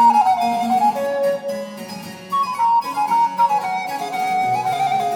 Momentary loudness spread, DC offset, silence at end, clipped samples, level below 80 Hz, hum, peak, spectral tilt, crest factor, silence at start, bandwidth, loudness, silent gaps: 11 LU; under 0.1%; 0 s; under 0.1%; -64 dBFS; none; -4 dBFS; -4 dB/octave; 14 dB; 0 s; 19 kHz; -19 LUFS; none